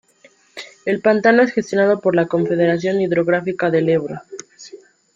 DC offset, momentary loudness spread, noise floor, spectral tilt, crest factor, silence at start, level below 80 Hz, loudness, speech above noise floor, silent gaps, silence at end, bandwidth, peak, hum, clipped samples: under 0.1%; 21 LU; -53 dBFS; -6.5 dB/octave; 16 dB; 0.55 s; -62 dBFS; -17 LUFS; 36 dB; none; 0.4 s; 7.8 kHz; -2 dBFS; none; under 0.1%